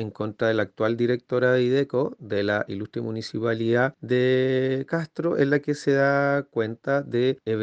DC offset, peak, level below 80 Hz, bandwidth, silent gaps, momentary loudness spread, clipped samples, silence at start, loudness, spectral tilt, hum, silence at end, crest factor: under 0.1%; -8 dBFS; -68 dBFS; 8.8 kHz; none; 8 LU; under 0.1%; 0 s; -24 LUFS; -7 dB/octave; none; 0 s; 16 dB